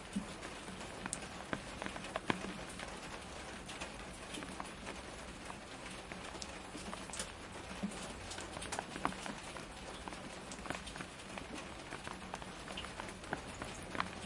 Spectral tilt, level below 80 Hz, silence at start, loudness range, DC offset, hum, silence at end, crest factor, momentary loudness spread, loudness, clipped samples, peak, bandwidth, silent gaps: -3.5 dB/octave; -58 dBFS; 0 s; 3 LU; under 0.1%; none; 0 s; 32 dB; 6 LU; -45 LUFS; under 0.1%; -12 dBFS; 11.5 kHz; none